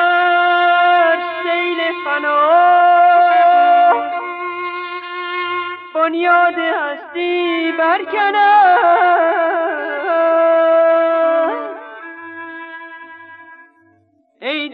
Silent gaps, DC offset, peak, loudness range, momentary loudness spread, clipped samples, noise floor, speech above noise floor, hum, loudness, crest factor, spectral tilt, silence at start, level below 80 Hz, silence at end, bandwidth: none; under 0.1%; -2 dBFS; 6 LU; 18 LU; under 0.1%; -56 dBFS; 43 dB; none; -14 LUFS; 12 dB; -5 dB/octave; 0 s; -84 dBFS; 0 s; 4.8 kHz